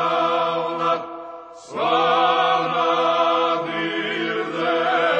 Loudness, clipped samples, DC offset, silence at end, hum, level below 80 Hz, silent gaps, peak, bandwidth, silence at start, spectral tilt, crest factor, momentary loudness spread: -20 LUFS; under 0.1%; under 0.1%; 0 s; none; -68 dBFS; none; -4 dBFS; 8.8 kHz; 0 s; -4.5 dB/octave; 16 dB; 11 LU